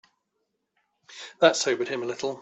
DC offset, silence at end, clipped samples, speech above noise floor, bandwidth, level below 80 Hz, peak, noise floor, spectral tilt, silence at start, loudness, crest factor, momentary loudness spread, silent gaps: under 0.1%; 0 s; under 0.1%; 53 dB; 8.4 kHz; -76 dBFS; -4 dBFS; -78 dBFS; -2.5 dB/octave; 1.1 s; -24 LUFS; 24 dB; 20 LU; none